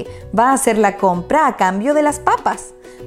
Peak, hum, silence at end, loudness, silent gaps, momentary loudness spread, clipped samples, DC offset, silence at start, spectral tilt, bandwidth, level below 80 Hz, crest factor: 0 dBFS; none; 0 s; -15 LUFS; none; 8 LU; under 0.1%; under 0.1%; 0 s; -4.5 dB/octave; 16 kHz; -44 dBFS; 16 dB